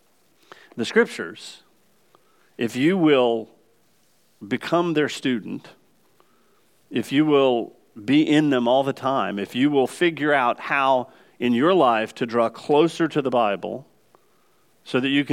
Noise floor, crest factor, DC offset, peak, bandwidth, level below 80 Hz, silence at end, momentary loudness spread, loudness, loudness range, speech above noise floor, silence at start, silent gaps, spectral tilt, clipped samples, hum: -63 dBFS; 18 dB; under 0.1%; -4 dBFS; 14.5 kHz; -76 dBFS; 0 s; 14 LU; -21 LUFS; 5 LU; 42 dB; 0.75 s; none; -5.5 dB/octave; under 0.1%; none